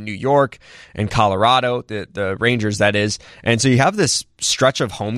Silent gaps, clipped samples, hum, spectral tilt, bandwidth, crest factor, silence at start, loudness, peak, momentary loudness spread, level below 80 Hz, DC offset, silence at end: none; under 0.1%; none; -4 dB/octave; 14.5 kHz; 16 dB; 0 s; -17 LUFS; -2 dBFS; 9 LU; -46 dBFS; under 0.1%; 0 s